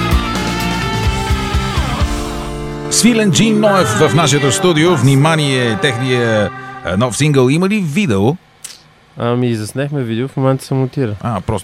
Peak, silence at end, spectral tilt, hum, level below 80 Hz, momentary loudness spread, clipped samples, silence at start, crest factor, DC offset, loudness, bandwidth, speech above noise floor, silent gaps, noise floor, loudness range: 0 dBFS; 0 s; -5 dB/octave; none; -28 dBFS; 10 LU; under 0.1%; 0 s; 14 dB; under 0.1%; -14 LUFS; 16 kHz; 27 dB; none; -40 dBFS; 6 LU